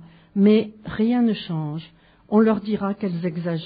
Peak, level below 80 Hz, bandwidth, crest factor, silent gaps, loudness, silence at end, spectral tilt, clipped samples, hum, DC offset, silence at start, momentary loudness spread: -6 dBFS; -56 dBFS; 5 kHz; 16 dB; none; -22 LUFS; 0 s; -7 dB/octave; under 0.1%; none; under 0.1%; 0 s; 13 LU